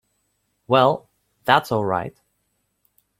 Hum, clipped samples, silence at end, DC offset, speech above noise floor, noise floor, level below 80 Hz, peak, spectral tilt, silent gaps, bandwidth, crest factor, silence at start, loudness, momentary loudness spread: 50 Hz at -55 dBFS; under 0.1%; 1.1 s; under 0.1%; 53 dB; -72 dBFS; -60 dBFS; 0 dBFS; -6 dB/octave; none; 16 kHz; 22 dB; 0.7 s; -20 LUFS; 12 LU